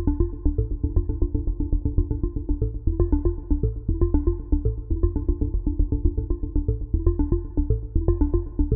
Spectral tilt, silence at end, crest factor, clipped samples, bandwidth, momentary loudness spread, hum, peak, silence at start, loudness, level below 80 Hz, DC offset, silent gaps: -16 dB/octave; 0 s; 18 dB; under 0.1%; 1.8 kHz; 4 LU; none; -6 dBFS; 0 s; -26 LUFS; -24 dBFS; under 0.1%; none